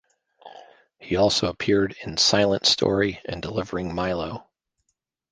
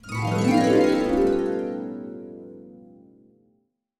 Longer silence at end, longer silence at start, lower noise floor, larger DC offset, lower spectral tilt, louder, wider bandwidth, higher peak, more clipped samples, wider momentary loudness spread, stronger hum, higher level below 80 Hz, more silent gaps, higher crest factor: second, 0.9 s vs 1.2 s; first, 0.45 s vs 0.05 s; first, -77 dBFS vs -69 dBFS; neither; second, -3.5 dB/octave vs -6.5 dB/octave; about the same, -22 LUFS vs -22 LUFS; second, 10 kHz vs 14.5 kHz; first, -4 dBFS vs -8 dBFS; neither; second, 11 LU vs 21 LU; neither; about the same, -48 dBFS vs -48 dBFS; neither; about the same, 20 dB vs 16 dB